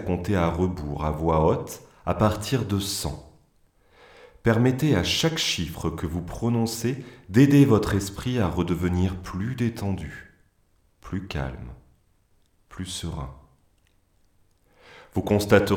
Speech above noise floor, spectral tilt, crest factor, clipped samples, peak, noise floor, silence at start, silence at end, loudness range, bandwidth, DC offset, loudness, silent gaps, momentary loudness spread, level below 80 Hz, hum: 41 dB; -5.5 dB/octave; 22 dB; under 0.1%; -4 dBFS; -64 dBFS; 0 s; 0 s; 14 LU; 18 kHz; under 0.1%; -25 LUFS; none; 15 LU; -44 dBFS; none